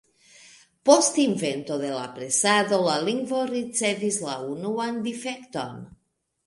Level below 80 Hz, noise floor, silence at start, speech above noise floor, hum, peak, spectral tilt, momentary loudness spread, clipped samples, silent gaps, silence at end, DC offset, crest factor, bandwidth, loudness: -70 dBFS; -73 dBFS; 0.85 s; 49 dB; none; -2 dBFS; -3 dB/octave; 14 LU; under 0.1%; none; 0.55 s; under 0.1%; 22 dB; 11.5 kHz; -24 LUFS